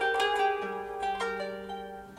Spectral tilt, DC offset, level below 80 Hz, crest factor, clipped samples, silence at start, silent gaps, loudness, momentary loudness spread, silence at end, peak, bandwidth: -3 dB/octave; under 0.1%; -60 dBFS; 16 dB; under 0.1%; 0 s; none; -31 LUFS; 13 LU; 0 s; -16 dBFS; 16 kHz